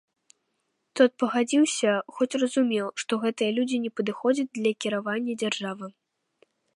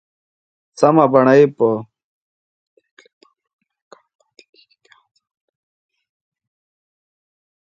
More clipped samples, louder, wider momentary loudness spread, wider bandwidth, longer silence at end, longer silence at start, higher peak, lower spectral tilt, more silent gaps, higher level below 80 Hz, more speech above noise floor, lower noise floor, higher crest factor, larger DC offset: neither; second, -26 LUFS vs -14 LUFS; about the same, 7 LU vs 8 LU; first, 11.5 kHz vs 8.8 kHz; second, 0.85 s vs 5.85 s; first, 0.95 s vs 0.8 s; second, -6 dBFS vs 0 dBFS; second, -4 dB/octave vs -7.5 dB/octave; neither; second, -80 dBFS vs -68 dBFS; first, 51 dB vs 43 dB; first, -77 dBFS vs -55 dBFS; about the same, 20 dB vs 20 dB; neither